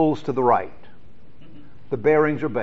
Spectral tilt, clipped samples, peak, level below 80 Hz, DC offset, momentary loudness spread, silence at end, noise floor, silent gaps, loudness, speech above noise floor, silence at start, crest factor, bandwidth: -6.5 dB/octave; under 0.1%; -4 dBFS; -56 dBFS; 2%; 11 LU; 0 s; -51 dBFS; none; -21 LUFS; 31 dB; 0 s; 18 dB; 7.4 kHz